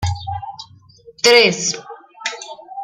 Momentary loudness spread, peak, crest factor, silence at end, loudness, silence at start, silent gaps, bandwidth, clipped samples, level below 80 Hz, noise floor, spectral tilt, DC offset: 22 LU; 0 dBFS; 20 dB; 0 s; -15 LUFS; 0 s; none; 15.5 kHz; under 0.1%; -48 dBFS; -45 dBFS; -2.5 dB/octave; under 0.1%